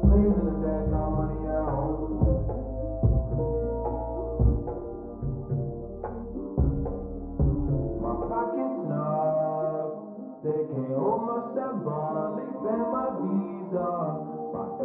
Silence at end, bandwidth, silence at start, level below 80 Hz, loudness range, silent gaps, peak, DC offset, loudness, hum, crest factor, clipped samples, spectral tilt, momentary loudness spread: 0 s; 2.6 kHz; 0 s; -34 dBFS; 3 LU; none; -10 dBFS; under 0.1%; -29 LUFS; none; 18 dB; under 0.1%; -13 dB/octave; 9 LU